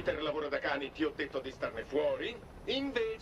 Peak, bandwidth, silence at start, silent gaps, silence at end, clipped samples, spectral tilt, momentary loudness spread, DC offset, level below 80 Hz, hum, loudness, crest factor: -20 dBFS; 12 kHz; 0 s; none; 0 s; under 0.1%; -5 dB/octave; 6 LU; under 0.1%; -58 dBFS; none; -36 LUFS; 16 dB